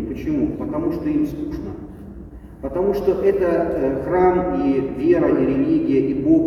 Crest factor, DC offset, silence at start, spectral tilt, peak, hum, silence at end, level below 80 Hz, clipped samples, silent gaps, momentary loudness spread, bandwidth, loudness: 14 dB; under 0.1%; 0 s; -9.5 dB/octave; -6 dBFS; none; 0 s; -40 dBFS; under 0.1%; none; 16 LU; 13.5 kHz; -20 LUFS